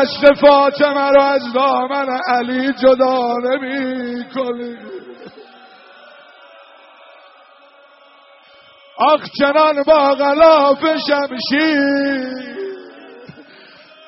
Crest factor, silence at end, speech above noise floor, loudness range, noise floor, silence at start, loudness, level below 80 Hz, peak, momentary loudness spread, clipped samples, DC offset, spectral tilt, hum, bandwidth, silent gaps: 16 dB; 0.65 s; 32 dB; 13 LU; -47 dBFS; 0 s; -14 LUFS; -54 dBFS; 0 dBFS; 16 LU; under 0.1%; under 0.1%; -1 dB/octave; none; 6 kHz; none